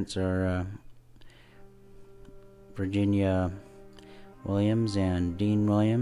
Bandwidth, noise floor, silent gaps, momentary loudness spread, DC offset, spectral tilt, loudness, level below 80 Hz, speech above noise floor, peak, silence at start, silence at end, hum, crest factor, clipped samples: 11.5 kHz; -51 dBFS; none; 16 LU; under 0.1%; -8 dB/octave; -28 LUFS; -44 dBFS; 25 dB; -14 dBFS; 0 s; 0 s; none; 16 dB; under 0.1%